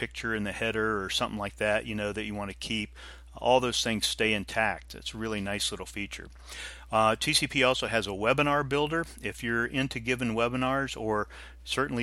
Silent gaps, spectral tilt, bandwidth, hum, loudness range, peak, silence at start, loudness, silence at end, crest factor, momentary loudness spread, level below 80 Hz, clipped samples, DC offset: none; -3.5 dB/octave; 16 kHz; none; 3 LU; -8 dBFS; 0 s; -29 LUFS; 0 s; 20 dB; 13 LU; -50 dBFS; under 0.1%; under 0.1%